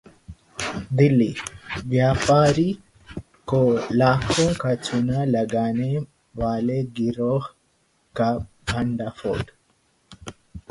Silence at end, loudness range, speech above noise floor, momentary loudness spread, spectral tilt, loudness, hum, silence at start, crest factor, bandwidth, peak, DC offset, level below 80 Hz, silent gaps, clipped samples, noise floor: 0.1 s; 6 LU; 44 dB; 19 LU; -6.5 dB/octave; -22 LUFS; none; 0.3 s; 20 dB; 11.5 kHz; -4 dBFS; under 0.1%; -44 dBFS; none; under 0.1%; -65 dBFS